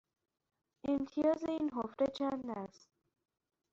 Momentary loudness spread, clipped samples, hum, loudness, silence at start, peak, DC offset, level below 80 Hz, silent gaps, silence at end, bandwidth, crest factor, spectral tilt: 11 LU; under 0.1%; none; -37 LUFS; 0.85 s; -22 dBFS; under 0.1%; -72 dBFS; none; 1.05 s; 7.6 kHz; 18 dB; -5 dB/octave